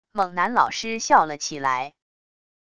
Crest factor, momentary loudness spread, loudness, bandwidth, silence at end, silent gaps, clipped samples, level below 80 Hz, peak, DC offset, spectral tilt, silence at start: 20 dB; 8 LU; -22 LUFS; 11 kHz; 0.75 s; none; under 0.1%; -62 dBFS; -4 dBFS; 0.4%; -2.5 dB/octave; 0.15 s